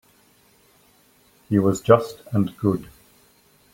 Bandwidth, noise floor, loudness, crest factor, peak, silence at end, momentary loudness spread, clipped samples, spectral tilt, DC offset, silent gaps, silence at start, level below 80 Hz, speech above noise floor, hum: 16.5 kHz; -58 dBFS; -21 LUFS; 22 dB; -2 dBFS; 0.9 s; 8 LU; under 0.1%; -7.5 dB/octave; under 0.1%; none; 1.5 s; -58 dBFS; 38 dB; none